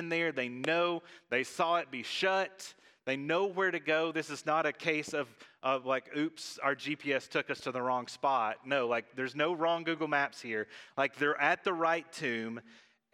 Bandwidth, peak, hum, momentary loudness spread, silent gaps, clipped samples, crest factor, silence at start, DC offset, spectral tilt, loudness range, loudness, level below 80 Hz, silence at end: 14.5 kHz; -12 dBFS; none; 8 LU; none; under 0.1%; 22 dB; 0 s; under 0.1%; -4 dB/octave; 2 LU; -33 LUFS; -86 dBFS; 0.4 s